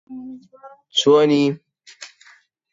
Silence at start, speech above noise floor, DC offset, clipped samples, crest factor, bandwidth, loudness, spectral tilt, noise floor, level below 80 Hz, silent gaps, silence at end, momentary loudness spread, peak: 0.1 s; 35 dB; under 0.1%; under 0.1%; 18 dB; 7.8 kHz; -17 LUFS; -5 dB/octave; -53 dBFS; -70 dBFS; none; 0.7 s; 25 LU; -4 dBFS